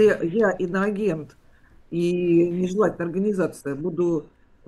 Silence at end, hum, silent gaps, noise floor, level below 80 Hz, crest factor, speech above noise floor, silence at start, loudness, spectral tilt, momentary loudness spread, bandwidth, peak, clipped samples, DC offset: 0.4 s; none; none; -52 dBFS; -54 dBFS; 16 dB; 30 dB; 0 s; -23 LUFS; -7.5 dB/octave; 9 LU; 12 kHz; -8 dBFS; under 0.1%; under 0.1%